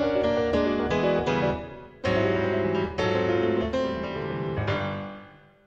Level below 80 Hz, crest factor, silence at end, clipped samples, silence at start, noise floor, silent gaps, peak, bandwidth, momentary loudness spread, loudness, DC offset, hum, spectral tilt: -46 dBFS; 14 dB; 0.35 s; under 0.1%; 0 s; -49 dBFS; none; -12 dBFS; 8 kHz; 8 LU; -26 LUFS; under 0.1%; none; -7 dB/octave